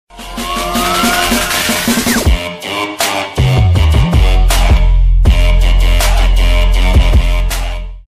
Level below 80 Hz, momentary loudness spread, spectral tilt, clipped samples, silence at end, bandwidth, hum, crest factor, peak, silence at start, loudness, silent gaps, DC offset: -12 dBFS; 7 LU; -4.5 dB/octave; under 0.1%; 0.05 s; 15.5 kHz; none; 10 dB; 0 dBFS; 0.15 s; -12 LUFS; none; under 0.1%